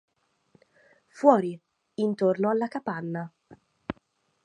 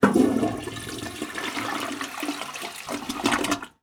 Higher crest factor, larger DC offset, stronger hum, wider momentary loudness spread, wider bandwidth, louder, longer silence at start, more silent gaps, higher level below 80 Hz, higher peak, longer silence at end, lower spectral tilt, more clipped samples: about the same, 24 dB vs 24 dB; neither; neither; first, 21 LU vs 11 LU; second, 9.8 kHz vs over 20 kHz; about the same, -26 LUFS vs -27 LUFS; first, 1.15 s vs 0 s; neither; second, -66 dBFS vs -54 dBFS; about the same, -4 dBFS vs -4 dBFS; first, 0.55 s vs 0.15 s; first, -8 dB/octave vs -4 dB/octave; neither